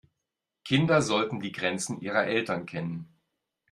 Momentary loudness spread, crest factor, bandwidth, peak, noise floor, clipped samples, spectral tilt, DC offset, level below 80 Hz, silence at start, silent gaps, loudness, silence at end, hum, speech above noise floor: 12 LU; 20 dB; 13 kHz; -10 dBFS; -85 dBFS; under 0.1%; -5 dB/octave; under 0.1%; -66 dBFS; 0.65 s; none; -28 LUFS; 0.65 s; none; 58 dB